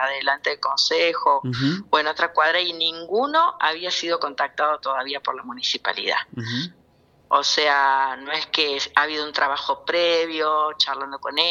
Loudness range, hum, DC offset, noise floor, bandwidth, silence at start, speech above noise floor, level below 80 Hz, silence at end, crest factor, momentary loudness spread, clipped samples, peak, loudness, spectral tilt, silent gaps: 4 LU; none; under 0.1%; -57 dBFS; 11.5 kHz; 0 s; 35 dB; -66 dBFS; 0 s; 22 dB; 7 LU; under 0.1%; 0 dBFS; -21 LUFS; -3 dB/octave; none